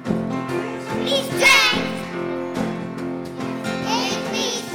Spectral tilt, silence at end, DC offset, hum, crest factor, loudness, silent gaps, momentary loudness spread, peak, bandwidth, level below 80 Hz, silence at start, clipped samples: -3 dB/octave; 0 s; under 0.1%; none; 16 dB; -21 LUFS; none; 15 LU; -6 dBFS; over 20 kHz; -54 dBFS; 0 s; under 0.1%